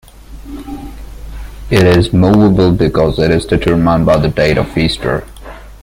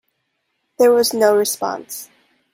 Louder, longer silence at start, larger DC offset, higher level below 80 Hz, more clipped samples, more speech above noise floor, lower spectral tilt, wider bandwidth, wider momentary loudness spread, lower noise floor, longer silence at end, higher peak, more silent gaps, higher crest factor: first, -11 LUFS vs -16 LUFS; second, 0.3 s vs 0.8 s; neither; first, -28 dBFS vs -66 dBFS; neither; second, 21 dB vs 55 dB; first, -7 dB/octave vs -2.5 dB/octave; about the same, 16 kHz vs 16.5 kHz; first, 22 LU vs 17 LU; second, -31 dBFS vs -71 dBFS; second, 0.05 s vs 0.5 s; about the same, 0 dBFS vs -2 dBFS; neither; second, 12 dB vs 18 dB